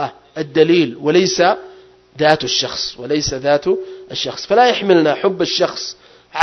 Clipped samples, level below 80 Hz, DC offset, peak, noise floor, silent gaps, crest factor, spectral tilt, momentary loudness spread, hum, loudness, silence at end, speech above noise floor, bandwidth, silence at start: under 0.1%; -50 dBFS; under 0.1%; 0 dBFS; -43 dBFS; none; 16 dB; -4 dB/octave; 12 LU; none; -16 LUFS; 0 s; 28 dB; 6.4 kHz; 0 s